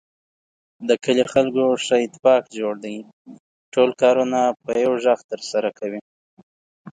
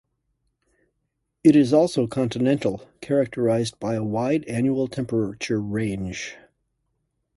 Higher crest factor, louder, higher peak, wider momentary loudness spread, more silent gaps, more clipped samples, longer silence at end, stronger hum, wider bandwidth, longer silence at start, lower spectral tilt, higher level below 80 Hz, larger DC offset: about the same, 18 dB vs 20 dB; first, -20 LUFS vs -23 LUFS; about the same, -4 dBFS vs -4 dBFS; about the same, 13 LU vs 11 LU; first, 2.19-2.23 s, 3.13-3.25 s, 3.40-3.72 s, 5.24-5.29 s, 6.01-6.37 s, 6.43-6.85 s vs none; neither; second, 0.05 s vs 1 s; neither; second, 9.4 kHz vs 11.5 kHz; second, 0.8 s vs 1.45 s; second, -4.5 dB/octave vs -6.5 dB/octave; second, -66 dBFS vs -54 dBFS; neither